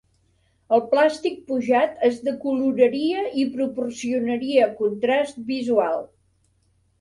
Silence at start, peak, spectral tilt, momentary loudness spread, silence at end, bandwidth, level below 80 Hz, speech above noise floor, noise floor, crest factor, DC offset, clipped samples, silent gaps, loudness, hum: 0.7 s; -6 dBFS; -5 dB/octave; 7 LU; 0.95 s; 11.5 kHz; -66 dBFS; 43 dB; -65 dBFS; 18 dB; under 0.1%; under 0.1%; none; -22 LUFS; none